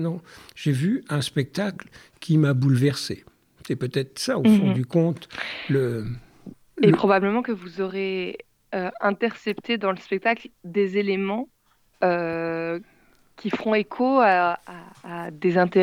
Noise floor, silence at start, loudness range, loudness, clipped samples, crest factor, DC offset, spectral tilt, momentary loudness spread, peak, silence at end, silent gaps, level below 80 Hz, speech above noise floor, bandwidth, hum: -46 dBFS; 0 s; 4 LU; -24 LUFS; under 0.1%; 20 dB; under 0.1%; -6.5 dB/octave; 16 LU; -4 dBFS; 0 s; none; -60 dBFS; 23 dB; 15.5 kHz; none